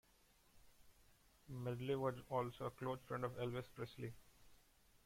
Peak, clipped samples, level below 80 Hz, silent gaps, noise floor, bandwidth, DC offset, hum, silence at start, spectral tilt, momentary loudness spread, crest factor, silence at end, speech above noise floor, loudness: -28 dBFS; under 0.1%; -72 dBFS; none; -73 dBFS; 16.5 kHz; under 0.1%; none; 0.55 s; -7 dB/octave; 11 LU; 20 dB; 0.5 s; 28 dB; -46 LUFS